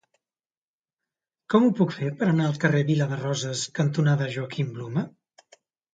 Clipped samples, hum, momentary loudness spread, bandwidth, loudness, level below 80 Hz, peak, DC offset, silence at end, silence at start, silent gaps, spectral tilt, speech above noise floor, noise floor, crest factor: under 0.1%; none; 9 LU; 9.2 kHz; -25 LUFS; -68 dBFS; -6 dBFS; under 0.1%; 0.85 s; 1.5 s; none; -6 dB/octave; over 66 dB; under -90 dBFS; 18 dB